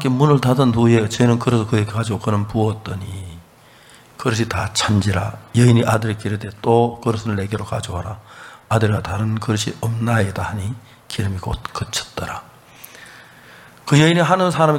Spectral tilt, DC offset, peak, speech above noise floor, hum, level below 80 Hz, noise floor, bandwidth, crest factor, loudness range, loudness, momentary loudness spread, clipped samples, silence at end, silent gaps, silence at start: -6 dB/octave; under 0.1%; 0 dBFS; 29 dB; none; -44 dBFS; -47 dBFS; 16 kHz; 18 dB; 6 LU; -19 LUFS; 17 LU; under 0.1%; 0 s; none; 0 s